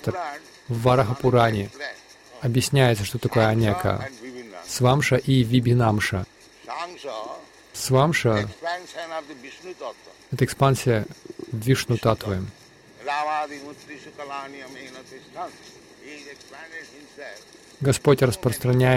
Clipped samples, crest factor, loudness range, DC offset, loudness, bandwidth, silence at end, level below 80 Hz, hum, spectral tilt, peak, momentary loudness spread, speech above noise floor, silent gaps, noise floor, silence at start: under 0.1%; 18 dB; 13 LU; under 0.1%; -23 LUFS; 16.5 kHz; 0 s; -50 dBFS; none; -6 dB/octave; -6 dBFS; 20 LU; 19 dB; none; -42 dBFS; 0 s